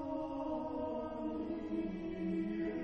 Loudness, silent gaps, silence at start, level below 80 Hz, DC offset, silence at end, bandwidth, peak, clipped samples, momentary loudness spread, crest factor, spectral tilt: -40 LUFS; none; 0 s; -58 dBFS; under 0.1%; 0 s; 6.2 kHz; -28 dBFS; under 0.1%; 3 LU; 12 dB; -9 dB/octave